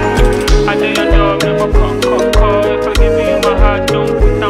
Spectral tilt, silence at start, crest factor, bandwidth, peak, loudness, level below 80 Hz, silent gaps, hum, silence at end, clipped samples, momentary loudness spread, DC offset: -5.5 dB/octave; 0 s; 10 dB; 14 kHz; 0 dBFS; -12 LUFS; -14 dBFS; none; none; 0 s; under 0.1%; 2 LU; under 0.1%